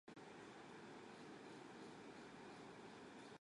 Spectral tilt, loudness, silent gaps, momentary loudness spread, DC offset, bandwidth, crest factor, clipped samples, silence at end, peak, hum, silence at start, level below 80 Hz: -4.5 dB/octave; -58 LUFS; none; 1 LU; under 0.1%; 11 kHz; 14 dB; under 0.1%; 0 s; -46 dBFS; none; 0.05 s; -86 dBFS